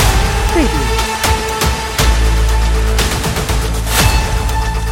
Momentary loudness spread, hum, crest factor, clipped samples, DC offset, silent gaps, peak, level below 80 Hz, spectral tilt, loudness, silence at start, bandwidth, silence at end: 4 LU; none; 12 dB; under 0.1%; under 0.1%; none; 0 dBFS; -16 dBFS; -4 dB/octave; -14 LUFS; 0 s; 17 kHz; 0 s